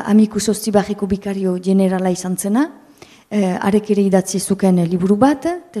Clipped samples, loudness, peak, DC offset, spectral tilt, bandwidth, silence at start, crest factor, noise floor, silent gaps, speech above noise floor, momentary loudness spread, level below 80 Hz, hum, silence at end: under 0.1%; -17 LUFS; 0 dBFS; under 0.1%; -6 dB/octave; 14.5 kHz; 0 s; 16 dB; -43 dBFS; none; 27 dB; 7 LU; -50 dBFS; none; 0 s